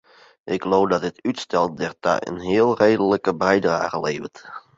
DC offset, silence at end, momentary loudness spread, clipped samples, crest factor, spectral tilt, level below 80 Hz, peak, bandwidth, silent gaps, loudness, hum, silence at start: under 0.1%; 0.2 s; 10 LU; under 0.1%; 18 dB; -5.5 dB/octave; -56 dBFS; -2 dBFS; 8 kHz; none; -21 LUFS; none; 0.45 s